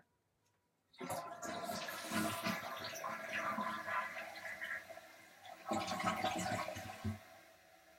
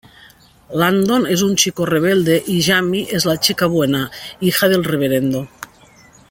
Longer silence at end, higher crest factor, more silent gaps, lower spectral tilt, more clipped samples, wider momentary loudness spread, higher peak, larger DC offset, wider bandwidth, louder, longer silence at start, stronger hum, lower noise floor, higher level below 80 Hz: second, 0 s vs 0.65 s; about the same, 20 dB vs 18 dB; neither; about the same, -3.5 dB/octave vs -4 dB/octave; neither; first, 15 LU vs 10 LU; second, -24 dBFS vs 0 dBFS; neither; about the same, 16.5 kHz vs 17 kHz; second, -42 LUFS vs -16 LUFS; first, 0.95 s vs 0.7 s; neither; first, -80 dBFS vs -47 dBFS; second, -76 dBFS vs -50 dBFS